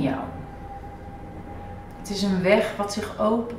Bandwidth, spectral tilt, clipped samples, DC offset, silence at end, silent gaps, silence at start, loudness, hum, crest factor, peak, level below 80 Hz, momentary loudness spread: 15.5 kHz; -5.5 dB/octave; under 0.1%; under 0.1%; 0 s; none; 0 s; -24 LUFS; none; 22 dB; -4 dBFS; -46 dBFS; 19 LU